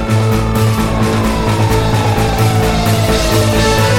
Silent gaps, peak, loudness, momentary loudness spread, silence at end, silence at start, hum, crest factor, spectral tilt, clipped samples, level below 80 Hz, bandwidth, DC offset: none; -2 dBFS; -13 LUFS; 2 LU; 0 s; 0 s; none; 10 dB; -5.5 dB/octave; under 0.1%; -22 dBFS; 17 kHz; under 0.1%